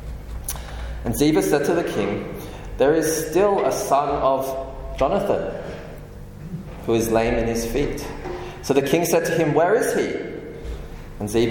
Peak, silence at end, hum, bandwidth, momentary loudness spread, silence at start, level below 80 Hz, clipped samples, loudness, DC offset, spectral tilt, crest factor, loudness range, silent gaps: -4 dBFS; 0 s; none; 17.5 kHz; 16 LU; 0 s; -36 dBFS; under 0.1%; -22 LUFS; under 0.1%; -5 dB/octave; 18 dB; 4 LU; none